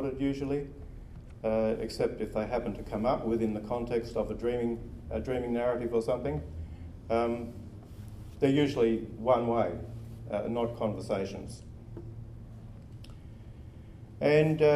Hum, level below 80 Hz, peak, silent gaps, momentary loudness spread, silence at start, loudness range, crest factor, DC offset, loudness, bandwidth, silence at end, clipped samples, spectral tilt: none; -48 dBFS; -12 dBFS; none; 21 LU; 0 s; 7 LU; 20 dB; under 0.1%; -31 LUFS; 13 kHz; 0 s; under 0.1%; -7.5 dB/octave